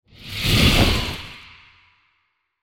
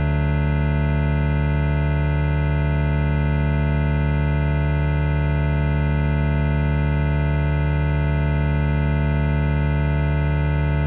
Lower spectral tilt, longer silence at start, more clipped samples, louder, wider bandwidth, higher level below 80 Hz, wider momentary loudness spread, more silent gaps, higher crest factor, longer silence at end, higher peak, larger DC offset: second, -4 dB/octave vs -7.5 dB/octave; first, 0.2 s vs 0 s; neither; first, -18 LUFS vs -21 LUFS; first, 17 kHz vs 4.1 kHz; second, -30 dBFS vs -24 dBFS; first, 21 LU vs 0 LU; neither; first, 20 dB vs 10 dB; first, 1.25 s vs 0 s; first, -2 dBFS vs -8 dBFS; neither